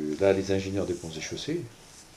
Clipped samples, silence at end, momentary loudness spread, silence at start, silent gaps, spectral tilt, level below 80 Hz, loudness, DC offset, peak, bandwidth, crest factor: under 0.1%; 0 s; 13 LU; 0 s; none; -5.5 dB/octave; -58 dBFS; -29 LUFS; under 0.1%; -10 dBFS; 14 kHz; 20 dB